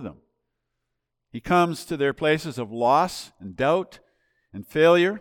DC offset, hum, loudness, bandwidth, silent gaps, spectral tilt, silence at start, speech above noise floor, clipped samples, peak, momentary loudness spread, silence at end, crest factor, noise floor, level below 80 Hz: under 0.1%; none; -22 LUFS; 17.5 kHz; none; -5.5 dB/octave; 0 s; 58 dB; under 0.1%; -8 dBFS; 21 LU; 0 s; 18 dB; -80 dBFS; -58 dBFS